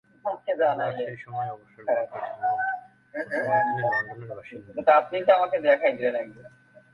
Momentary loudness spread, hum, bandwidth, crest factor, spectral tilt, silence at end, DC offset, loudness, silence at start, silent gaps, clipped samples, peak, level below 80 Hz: 16 LU; none; 5.8 kHz; 20 dB; -7 dB/octave; 0.45 s; under 0.1%; -25 LUFS; 0.25 s; none; under 0.1%; -6 dBFS; -70 dBFS